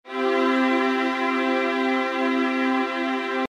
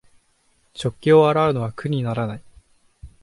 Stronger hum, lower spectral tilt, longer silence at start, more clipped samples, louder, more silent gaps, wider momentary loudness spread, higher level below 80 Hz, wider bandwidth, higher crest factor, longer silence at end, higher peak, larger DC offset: neither; second, -3.5 dB/octave vs -7.5 dB/octave; second, 0.05 s vs 0.75 s; neither; about the same, -22 LUFS vs -20 LUFS; neither; second, 3 LU vs 16 LU; second, -76 dBFS vs -52 dBFS; second, 10 kHz vs 11.5 kHz; second, 12 dB vs 18 dB; second, 0 s vs 0.15 s; second, -10 dBFS vs -4 dBFS; neither